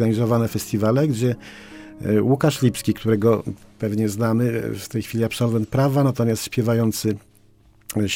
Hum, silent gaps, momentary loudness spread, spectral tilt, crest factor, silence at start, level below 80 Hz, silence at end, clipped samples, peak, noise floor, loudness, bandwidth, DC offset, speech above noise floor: none; none; 10 LU; -6.5 dB/octave; 16 dB; 0 s; -52 dBFS; 0 s; under 0.1%; -4 dBFS; -53 dBFS; -21 LUFS; 17 kHz; under 0.1%; 33 dB